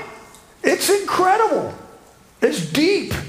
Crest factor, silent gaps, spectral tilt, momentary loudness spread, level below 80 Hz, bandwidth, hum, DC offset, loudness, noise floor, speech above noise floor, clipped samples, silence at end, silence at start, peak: 18 dB; none; -4 dB/octave; 13 LU; -48 dBFS; 16 kHz; none; under 0.1%; -18 LUFS; -47 dBFS; 29 dB; under 0.1%; 0 s; 0 s; -2 dBFS